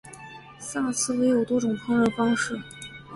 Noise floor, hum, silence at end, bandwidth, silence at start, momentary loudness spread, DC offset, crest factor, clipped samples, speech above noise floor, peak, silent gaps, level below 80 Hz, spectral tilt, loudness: -44 dBFS; none; 0 s; 11.5 kHz; 0.05 s; 18 LU; under 0.1%; 14 dB; under 0.1%; 20 dB; -12 dBFS; none; -58 dBFS; -4 dB/octave; -25 LUFS